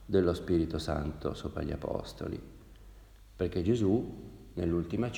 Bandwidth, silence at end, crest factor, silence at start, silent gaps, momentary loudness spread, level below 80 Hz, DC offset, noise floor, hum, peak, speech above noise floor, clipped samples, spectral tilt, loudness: 16.5 kHz; 0 s; 18 dB; 0 s; none; 14 LU; -46 dBFS; under 0.1%; -53 dBFS; none; -14 dBFS; 22 dB; under 0.1%; -7.5 dB/octave; -33 LUFS